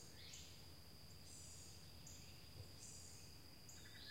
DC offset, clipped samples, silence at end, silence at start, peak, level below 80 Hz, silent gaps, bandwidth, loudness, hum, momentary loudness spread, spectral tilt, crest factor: under 0.1%; under 0.1%; 0 s; 0 s; -42 dBFS; -70 dBFS; none; 16 kHz; -58 LUFS; none; 4 LU; -2.5 dB/octave; 16 dB